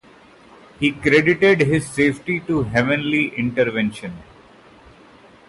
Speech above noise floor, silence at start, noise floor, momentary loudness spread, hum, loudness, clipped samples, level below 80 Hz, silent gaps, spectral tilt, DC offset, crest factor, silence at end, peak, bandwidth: 29 dB; 0.8 s; -48 dBFS; 10 LU; none; -18 LUFS; under 0.1%; -48 dBFS; none; -6 dB/octave; under 0.1%; 18 dB; 1.25 s; -4 dBFS; 11.5 kHz